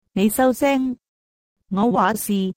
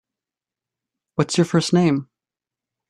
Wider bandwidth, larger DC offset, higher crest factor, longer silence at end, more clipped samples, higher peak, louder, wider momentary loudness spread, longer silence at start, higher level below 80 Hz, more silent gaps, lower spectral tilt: first, 16 kHz vs 11.5 kHz; neither; second, 14 dB vs 20 dB; second, 0.05 s vs 0.85 s; neither; about the same, -6 dBFS vs -4 dBFS; about the same, -20 LUFS vs -20 LUFS; about the same, 10 LU vs 8 LU; second, 0.15 s vs 1.2 s; first, -54 dBFS vs -60 dBFS; first, 1.08-1.56 s vs none; about the same, -5.5 dB/octave vs -5.5 dB/octave